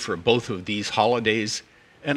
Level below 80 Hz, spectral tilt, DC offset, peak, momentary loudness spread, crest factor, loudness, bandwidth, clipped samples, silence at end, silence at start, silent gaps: -58 dBFS; -4 dB/octave; under 0.1%; -4 dBFS; 9 LU; 20 dB; -24 LUFS; 12.5 kHz; under 0.1%; 0 s; 0 s; none